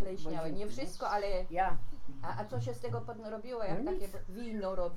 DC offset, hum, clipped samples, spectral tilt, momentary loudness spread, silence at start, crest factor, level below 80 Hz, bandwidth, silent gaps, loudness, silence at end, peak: under 0.1%; none; under 0.1%; -6.5 dB/octave; 9 LU; 0 s; 14 dB; -44 dBFS; 13.5 kHz; none; -38 LUFS; 0 s; -18 dBFS